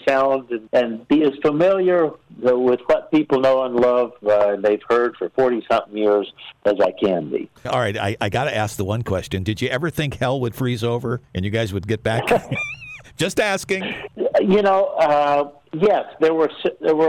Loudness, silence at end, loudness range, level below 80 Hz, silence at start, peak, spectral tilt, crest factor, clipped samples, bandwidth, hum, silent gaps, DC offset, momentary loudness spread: -20 LUFS; 0 s; 5 LU; -50 dBFS; 0.05 s; -10 dBFS; -6 dB/octave; 10 dB; under 0.1%; 16 kHz; none; none; under 0.1%; 8 LU